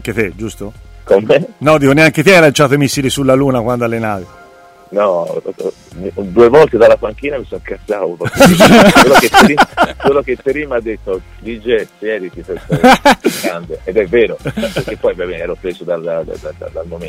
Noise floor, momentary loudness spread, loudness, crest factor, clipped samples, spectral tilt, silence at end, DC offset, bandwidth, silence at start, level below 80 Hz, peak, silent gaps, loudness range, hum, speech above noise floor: -40 dBFS; 18 LU; -11 LUFS; 12 dB; 0.5%; -5 dB/octave; 0 s; under 0.1%; 16.5 kHz; 0 s; -36 dBFS; 0 dBFS; none; 8 LU; none; 29 dB